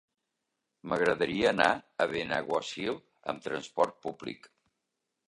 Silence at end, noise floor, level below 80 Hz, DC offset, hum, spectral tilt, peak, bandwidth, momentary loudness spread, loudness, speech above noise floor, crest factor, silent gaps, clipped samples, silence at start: 0.8 s; -84 dBFS; -66 dBFS; under 0.1%; none; -4.5 dB/octave; -8 dBFS; 11.5 kHz; 13 LU; -31 LUFS; 54 dB; 24 dB; none; under 0.1%; 0.85 s